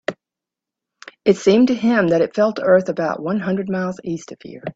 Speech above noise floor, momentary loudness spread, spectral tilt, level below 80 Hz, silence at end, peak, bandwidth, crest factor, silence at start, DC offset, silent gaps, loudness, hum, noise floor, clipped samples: 69 dB; 14 LU; -6.5 dB/octave; -60 dBFS; 0.05 s; 0 dBFS; 8 kHz; 18 dB; 0.1 s; under 0.1%; none; -18 LUFS; none; -86 dBFS; under 0.1%